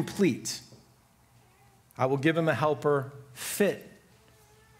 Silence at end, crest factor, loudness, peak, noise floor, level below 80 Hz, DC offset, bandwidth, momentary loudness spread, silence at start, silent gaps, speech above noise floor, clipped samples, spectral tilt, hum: 0.9 s; 20 dB; -28 LUFS; -10 dBFS; -62 dBFS; -68 dBFS; under 0.1%; 16 kHz; 14 LU; 0 s; none; 34 dB; under 0.1%; -5 dB/octave; none